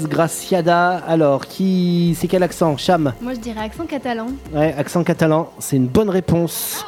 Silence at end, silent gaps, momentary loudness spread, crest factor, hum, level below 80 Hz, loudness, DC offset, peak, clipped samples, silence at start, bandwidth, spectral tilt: 0 s; none; 9 LU; 16 dB; none; -44 dBFS; -18 LUFS; under 0.1%; -2 dBFS; under 0.1%; 0 s; 17 kHz; -6 dB/octave